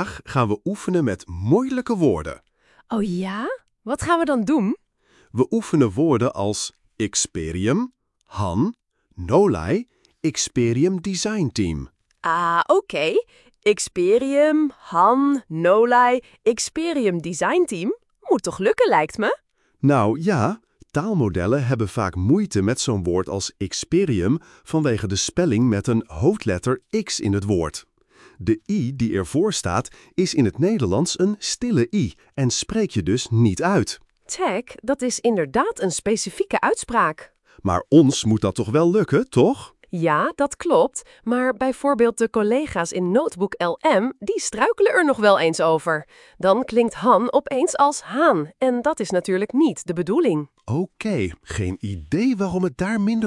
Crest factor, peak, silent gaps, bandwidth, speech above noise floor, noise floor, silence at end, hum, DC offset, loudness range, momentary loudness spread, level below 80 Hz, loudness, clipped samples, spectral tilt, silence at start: 18 dB; -2 dBFS; none; 12 kHz; 38 dB; -59 dBFS; 0 s; none; under 0.1%; 4 LU; 9 LU; -50 dBFS; -21 LUFS; under 0.1%; -5.5 dB/octave; 0 s